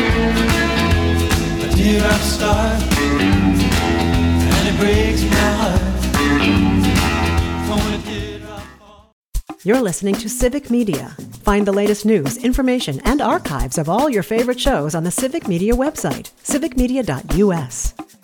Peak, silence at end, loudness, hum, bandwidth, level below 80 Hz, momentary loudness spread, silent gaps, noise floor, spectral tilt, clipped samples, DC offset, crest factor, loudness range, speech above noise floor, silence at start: -2 dBFS; 0.2 s; -17 LUFS; none; 19.5 kHz; -26 dBFS; 9 LU; 9.13-9.32 s; -42 dBFS; -5 dB/octave; under 0.1%; under 0.1%; 14 dB; 5 LU; 25 dB; 0 s